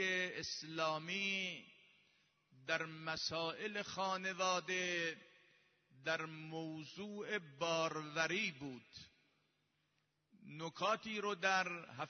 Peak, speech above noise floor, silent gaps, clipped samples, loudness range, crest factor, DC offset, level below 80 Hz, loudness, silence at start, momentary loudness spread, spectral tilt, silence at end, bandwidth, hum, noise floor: -20 dBFS; 41 dB; none; under 0.1%; 3 LU; 22 dB; under 0.1%; -82 dBFS; -40 LUFS; 0 s; 12 LU; -1.5 dB/octave; 0 s; 6.4 kHz; none; -83 dBFS